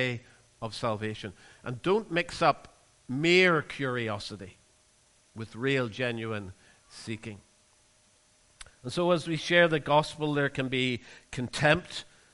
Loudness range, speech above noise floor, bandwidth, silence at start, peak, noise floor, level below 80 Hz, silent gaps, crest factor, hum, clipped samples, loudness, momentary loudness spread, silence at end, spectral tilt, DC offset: 8 LU; 35 dB; 11.5 kHz; 0 s; -8 dBFS; -64 dBFS; -60 dBFS; none; 22 dB; none; under 0.1%; -28 LUFS; 19 LU; 0.3 s; -5 dB/octave; under 0.1%